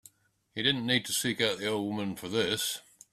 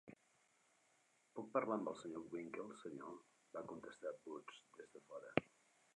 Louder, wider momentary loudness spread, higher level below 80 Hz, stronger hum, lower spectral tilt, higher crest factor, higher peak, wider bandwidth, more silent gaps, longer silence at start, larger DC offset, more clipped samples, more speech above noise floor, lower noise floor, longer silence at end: first, -29 LUFS vs -48 LUFS; second, 7 LU vs 17 LU; first, -68 dBFS vs -82 dBFS; neither; second, -3 dB/octave vs -6 dB/octave; second, 22 dB vs 34 dB; first, -10 dBFS vs -16 dBFS; first, 16 kHz vs 11 kHz; neither; first, 0.55 s vs 0.05 s; neither; neither; first, 36 dB vs 30 dB; second, -67 dBFS vs -78 dBFS; second, 0.3 s vs 0.5 s